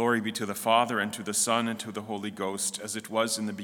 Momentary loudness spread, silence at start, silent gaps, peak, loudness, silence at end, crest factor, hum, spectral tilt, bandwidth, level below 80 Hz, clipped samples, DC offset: 10 LU; 0 s; none; -8 dBFS; -28 LUFS; 0 s; 20 dB; none; -2.5 dB/octave; 18 kHz; -78 dBFS; under 0.1%; under 0.1%